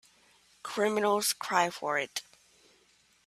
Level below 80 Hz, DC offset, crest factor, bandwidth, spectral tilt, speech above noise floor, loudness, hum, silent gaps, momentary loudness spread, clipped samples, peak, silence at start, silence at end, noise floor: -78 dBFS; under 0.1%; 22 dB; 15.5 kHz; -2 dB/octave; 37 dB; -30 LUFS; none; none; 12 LU; under 0.1%; -10 dBFS; 0.65 s; 1.05 s; -66 dBFS